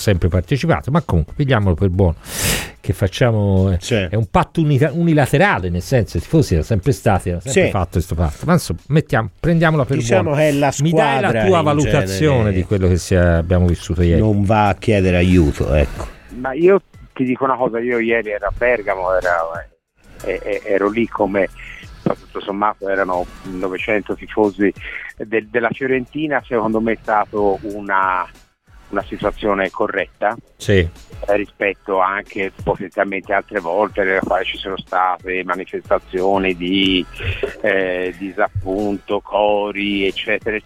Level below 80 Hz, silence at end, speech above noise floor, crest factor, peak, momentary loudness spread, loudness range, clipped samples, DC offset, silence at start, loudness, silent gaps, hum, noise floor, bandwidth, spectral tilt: -32 dBFS; 0.05 s; 29 dB; 16 dB; -2 dBFS; 9 LU; 5 LU; under 0.1%; 0.1%; 0 s; -18 LUFS; none; none; -46 dBFS; 16.5 kHz; -6 dB/octave